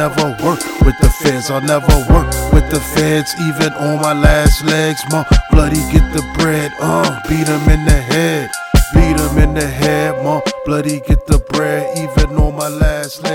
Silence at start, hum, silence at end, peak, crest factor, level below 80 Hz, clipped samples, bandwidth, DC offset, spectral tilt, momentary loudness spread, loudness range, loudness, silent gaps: 0 s; none; 0 s; 0 dBFS; 12 dB; -16 dBFS; 0.2%; 17 kHz; under 0.1%; -5.5 dB/octave; 5 LU; 2 LU; -14 LUFS; none